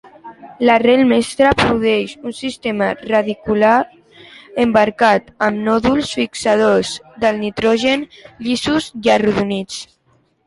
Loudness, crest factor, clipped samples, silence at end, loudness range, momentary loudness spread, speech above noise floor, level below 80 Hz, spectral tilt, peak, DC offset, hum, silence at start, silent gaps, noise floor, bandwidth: -16 LUFS; 16 dB; under 0.1%; 0.65 s; 2 LU; 12 LU; 43 dB; -44 dBFS; -5 dB/octave; 0 dBFS; under 0.1%; none; 0.25 s; none; -58 dBFS; 11.5 kHz